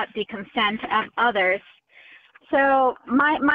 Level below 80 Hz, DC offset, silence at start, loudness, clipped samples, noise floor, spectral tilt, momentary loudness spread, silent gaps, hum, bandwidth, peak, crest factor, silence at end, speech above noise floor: -60 dBFS; under 0.1%; 0 s; -22 LUFS; under 0.1%; -51 dBFS; -7 dB/octave; 9 LU; none; none; 5 kHz; -8 dBFS; 14 dB; 0 s; 29 dB